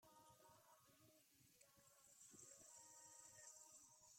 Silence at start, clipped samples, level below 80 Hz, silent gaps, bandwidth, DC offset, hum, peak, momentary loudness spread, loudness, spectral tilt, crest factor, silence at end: 0 s; under 0.1%; under -90 dBFS; none; 16.5 kHz; under 0.1%; none; -50 dBFS; 7 LU; -64 LUFS; -1.5 dB/octave; 18 dB; 0 s